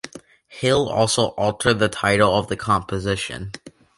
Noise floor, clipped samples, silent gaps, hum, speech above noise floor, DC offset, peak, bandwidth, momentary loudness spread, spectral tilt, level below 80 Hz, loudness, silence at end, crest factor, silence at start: -44 dBFS; under 0.1%; none; none; 24 dB; under 0.1%; -2 dBFS; 11.5 kHz; 14 LU; -4.5 dB/octave; -46 dBFS; -20 LUFS; 0.3 s; 18 dB; 0.05 s